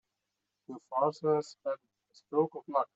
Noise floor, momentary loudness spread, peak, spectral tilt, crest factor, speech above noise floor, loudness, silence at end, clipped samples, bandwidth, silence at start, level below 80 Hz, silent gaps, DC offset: -86 dBFS; 12 LU; -16 dBFS; -7 dB/octave; 18 dB; 53 dB; -33 LUFS; 0.1 s; under 0.1%; 8 kHz; 0.7 s; -86 dBFS; none; under 0.1%